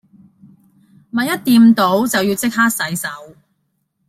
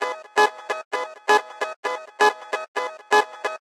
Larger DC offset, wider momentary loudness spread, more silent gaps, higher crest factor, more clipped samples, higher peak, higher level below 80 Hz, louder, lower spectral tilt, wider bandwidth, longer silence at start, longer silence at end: neither; first, 14 LU vs 9 LU; second, none vs 0.85-0.91 s, 1.76-1.83 s, 2.68-2.75 s; about the same, 14 dB vs 18 dB; neither; about the same, -2 dBFS vs -4 dBFS; first, -60 dBFS vs -82 dBFS; first, -15 LUFS vs -23 LUFS; first, -4 dB/octave vs -0.5 dB/octave; about the same, 16 kHz vs 15.5 kHz; first, 1.15 s vs 0 s; first, 0.8 s vs 0.1 s